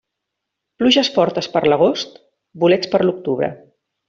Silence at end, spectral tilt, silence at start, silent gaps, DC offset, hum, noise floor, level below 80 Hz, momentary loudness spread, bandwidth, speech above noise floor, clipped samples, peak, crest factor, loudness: 0.55 s; -5 dB/octave; 0.8 s; none; under 0.1%; none; -79 dBFS; -60 dBFS; 9 LU; 7.6 kHz; 63 dB; under 0.1%; -2 dBFS; 16 dB; -17 LUFS